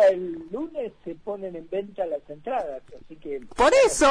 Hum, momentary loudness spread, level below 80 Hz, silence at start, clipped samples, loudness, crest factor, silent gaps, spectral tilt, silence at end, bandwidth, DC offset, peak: none; 18 LU; -48 dBFS; 0 s; under 0.1%; -26 LUFS; 14 dB; none; -3 dB/octave; 0 s; 11 kHz; under 0.1%; -10 dBFS